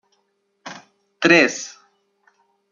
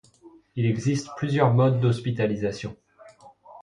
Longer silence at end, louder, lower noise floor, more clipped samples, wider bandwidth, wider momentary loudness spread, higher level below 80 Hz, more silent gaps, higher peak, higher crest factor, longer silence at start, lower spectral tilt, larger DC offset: first, 1.05 s vs 0.05 s; first, -16 LUFS vs -24 LUFS; first, -69 dBFS vs -53 dBFS; neither; second, 7.4 kHz vs 10 kHz; first, 24 LU vs 14 LU; second, -68 dBFS vs -58 dBFS; neither; first, 0 dBFS vs -6 dBFS; about the same, 22 dB vs 18 dB; first, 0.65 s vs 0.25 s; second, -3.5 dB/octave vs -7.5 dB/octave; neither